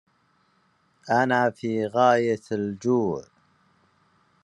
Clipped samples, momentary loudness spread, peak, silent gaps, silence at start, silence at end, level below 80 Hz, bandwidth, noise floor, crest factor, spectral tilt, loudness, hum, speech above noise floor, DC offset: under 0.1%; 9 LU; -6 dBFS; none; 1.05 s; 1.2 s; -70 dBFS; 10.5 kHz; -66 dBFS; 20 dB; -6.5 dB/octave; -24 LUFS; none; 43 dB; under 0.1%